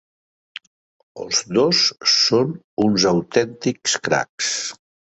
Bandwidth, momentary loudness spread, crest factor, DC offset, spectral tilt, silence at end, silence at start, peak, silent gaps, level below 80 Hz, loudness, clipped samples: 8.2 kHz; 20 LU; 18 dB; under 0.1%; -3 dB/octave; 0.4 s; 1.15 s; -2 dBFS; 2.64-2.77 s, 4.29-4.38 s; -58 dBFS; -18 LUFS; under 0.1%